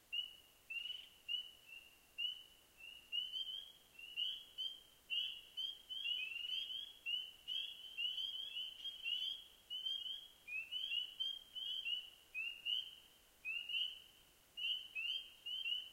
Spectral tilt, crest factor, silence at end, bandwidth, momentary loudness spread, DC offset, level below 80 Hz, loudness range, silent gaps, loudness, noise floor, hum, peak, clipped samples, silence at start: 1.5 dB/octave; 18 dB; 0 s; 16 kHz; 14 LU; under 0.1%; -80 dBFS; 3 LU; none; -43 LUFS; -68 dBFS; none; -30 dBFS; under 0.1%; 0.1 s